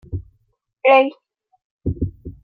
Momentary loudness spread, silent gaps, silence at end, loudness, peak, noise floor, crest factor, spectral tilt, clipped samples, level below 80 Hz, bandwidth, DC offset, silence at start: 18 LU; 1.64-1.79 s; 0.15 s; -18 LUFS; -2 dBFS; -66 dBFS; 18 dB; -8.5 dB/octave; under 0.1%; -40 dBFS; 4.9 kHz; under 0.1%; 0.1 s